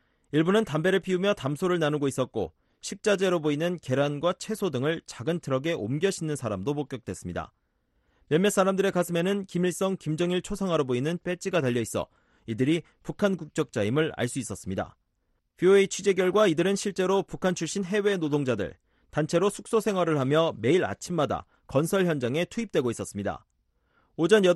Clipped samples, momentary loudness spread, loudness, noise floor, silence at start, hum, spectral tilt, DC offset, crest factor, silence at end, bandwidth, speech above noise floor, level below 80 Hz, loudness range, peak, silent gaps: under 0.1%; 10 LU; -27 LUFS; -74 dBFS; 0.35 s; none; -5.5 dB/octave; under 0.1%; 20 dB; 0 s; 12.5 kHz; 48 dB; -58 dBFS; 4 LU; -8 dBFS; none